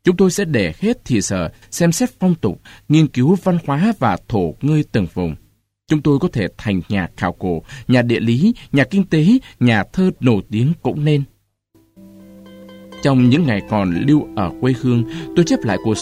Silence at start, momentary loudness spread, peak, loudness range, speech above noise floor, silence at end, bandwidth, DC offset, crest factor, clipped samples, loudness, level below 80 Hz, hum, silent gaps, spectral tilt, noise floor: 0.05 s; 8 LU; -2 dBFS; 4 LU; 40 dB; 0 s; 15 kHz; under 0.1%; 16 dB; under 0.1%; -17 LUFS; -44 dBFS; none; none; -6.5 dB/octave; -57 dBFS